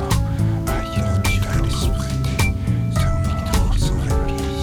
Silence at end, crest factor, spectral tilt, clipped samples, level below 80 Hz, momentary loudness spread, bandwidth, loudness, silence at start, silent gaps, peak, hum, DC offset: 0 s; 12 dB; -5.5 dB/octave; under 0.1%; -24 dBFS; 3 LU; 19 kHz; -21 LUFS; 0 s; none; -6 dBFS; none; under 0.1%